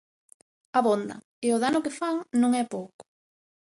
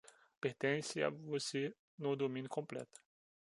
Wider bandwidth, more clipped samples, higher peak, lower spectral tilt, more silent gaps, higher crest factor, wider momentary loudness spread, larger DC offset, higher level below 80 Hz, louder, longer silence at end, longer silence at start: about the same, 11.5 kHz vs 11.5 kHz; neither; first, -8 dBFS vs -20 dBFS; about the same, -4.5 dB/octave vs -4.5 dB/octave; about the same, 1.24-1.42 s, 2.94-2.99 s vs 1.79-1.98 s; about the same, 18 dB vs 22 dB; first, 12 LU vs 8 LU; neither; first, -72 dBFS vs -86 dBFS; first, -26 LUFS vs -41 LUFS; about the same, 0.65 s vs 0.55 s; first, 0.75 s vs 0.45 s